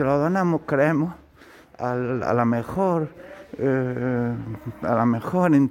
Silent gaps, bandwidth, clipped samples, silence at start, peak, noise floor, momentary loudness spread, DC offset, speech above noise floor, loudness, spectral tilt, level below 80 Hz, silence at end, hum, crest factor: none; 16 kHz; under 0.1%; 0 s; -6 dBFS; -50 dBFS; 11 LU; under 0.1%; 28 dB; -23 LUFS; -9 dB/octave; -54 dBFS; 0 s; none; 16 dB